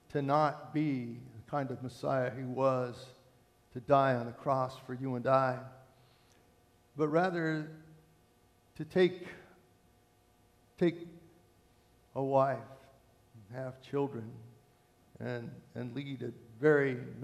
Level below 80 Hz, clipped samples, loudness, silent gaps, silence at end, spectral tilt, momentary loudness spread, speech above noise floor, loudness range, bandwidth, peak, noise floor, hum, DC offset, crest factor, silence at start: -72 dBFS; under 0.1%; -33 LUFS; none; 0 s; -7.5 dB/octave; 20 LU; 34 dB; 7 LU; 13 kHz; -14 dBFS; -67 dBFS; none; under 0.1%; 22 dB; 0.1 s